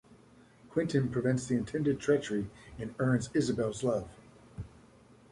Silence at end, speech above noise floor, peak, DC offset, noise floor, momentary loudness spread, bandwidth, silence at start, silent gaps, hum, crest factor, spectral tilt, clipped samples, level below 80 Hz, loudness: 0.65 s; 28 dB; -14 dBFS; under 0.1%; -59 dBFS; 18 LU; 11.5 kHz; 0.1 s; none; none; 18 dB; -6.5 dB/octave; under 0.1%; -58 dBFS; -32 LUFS